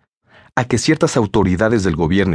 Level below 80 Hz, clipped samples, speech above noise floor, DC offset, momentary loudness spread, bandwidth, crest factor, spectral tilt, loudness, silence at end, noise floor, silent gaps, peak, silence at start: -38 dBFS; under 0.1%; 35 dB; under 0.1%; 5 LU; 11 kHz; 16 dB; -5.5 dB/octave; -16 LUFS; 0 s; -50 dBFS; none; -2 dBFS; 0.55 s